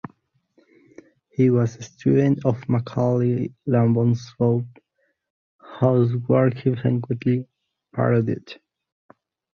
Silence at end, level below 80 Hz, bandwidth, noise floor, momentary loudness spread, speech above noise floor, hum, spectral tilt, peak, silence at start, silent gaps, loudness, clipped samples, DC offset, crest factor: 1 s; -58 dBFS; 7 kHz; -71 dBFS; 10 LU; 51 dB; none; -9 dB/octave; -4 dBFS; 1.4 s; 5.30-5.59 s; -22 LUFS; under 0.1%; under 0.1%; 18 dB